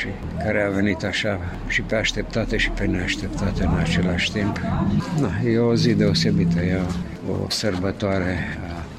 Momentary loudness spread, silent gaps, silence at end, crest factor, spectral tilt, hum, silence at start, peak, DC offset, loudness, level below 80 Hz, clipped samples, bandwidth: 9 LU; none; 0 s; 16 dB; -5.5 dB/octave; none; 0 s; -6 dBFS; 0.2%; -22 LUFS; -34 dBFS; under 0.1%; 13 kHz